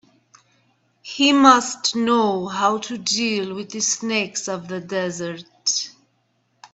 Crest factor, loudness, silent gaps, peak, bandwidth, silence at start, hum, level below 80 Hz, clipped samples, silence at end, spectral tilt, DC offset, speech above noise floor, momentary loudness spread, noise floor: 22 dB; -20 LUFS; none; 0 dBFS; 8.4 kHz; 1.05 s; none; -66 dBFS; under 0.1%; 0.05 s; -2.5 dB/octave; under 0.1%; 46 dB; 15 LU; -67 dBFS